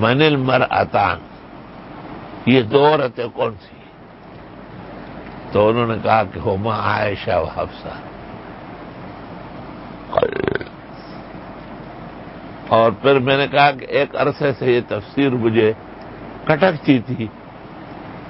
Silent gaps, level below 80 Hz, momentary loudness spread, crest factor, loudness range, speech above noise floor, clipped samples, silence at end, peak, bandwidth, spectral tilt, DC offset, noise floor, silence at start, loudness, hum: none; -46 dBFS; 21 LU; 20 dB; 9 LU; 24 dB; under 0.1%; 0 s; 0 dBFS; 5.8 kHz; -11 dB/octave; under 0.1%; -41 dBFS; 0 s; -18 LUFS; none